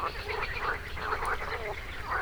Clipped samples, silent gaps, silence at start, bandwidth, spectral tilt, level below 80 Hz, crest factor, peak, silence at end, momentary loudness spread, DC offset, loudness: under 0.1%; none; 0 s; over 20 kHz; -4 dB/octave; -42 dBFS; 16 dB; -18 dBFS; 0 s; 4 LU; under 0.1%; -34 LUFS